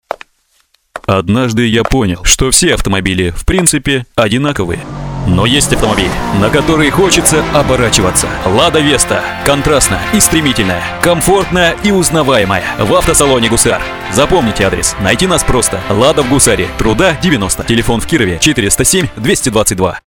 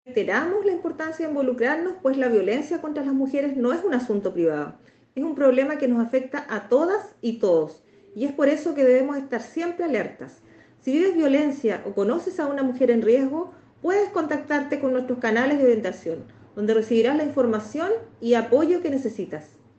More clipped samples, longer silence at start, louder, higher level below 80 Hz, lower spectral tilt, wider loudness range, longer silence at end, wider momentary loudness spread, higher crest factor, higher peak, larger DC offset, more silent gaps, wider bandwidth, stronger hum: first, 0.3% vs under 0.1%; about the same, 0.1 s vs 0.05 s; first, -10 LUFS vs -23 LUFS; first, -24 dBFS vs -70 dBFS; second, -3.5 dB/octave vs -6 dB/octave; about the same, 2 LU vs 2 LU; second, 0.05 s vs 0.3 s; second, 5 LU vs 11 LU; second, 10 dB vs 16 dB; first, 0 dBFS vs -6 dBFS; neither; neither; first, over 20 kHz vs 8.4 kHz; neither